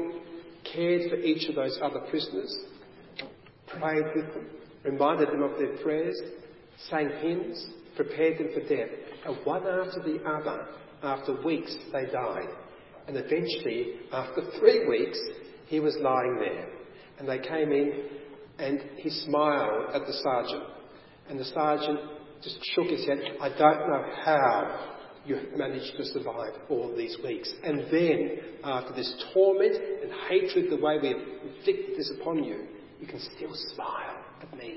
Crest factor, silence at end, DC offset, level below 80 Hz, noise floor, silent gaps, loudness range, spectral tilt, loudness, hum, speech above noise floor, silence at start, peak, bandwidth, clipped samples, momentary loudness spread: 24 dB; 0 s; under 0.1%; -70 dBFS; -51 dBFS; none; 5 LU; -9 dB/octave; -29 LUFS; none; 22 dB; 0 s; -6 dBFS; 5.8 kHz; under 0.1%; 17 LU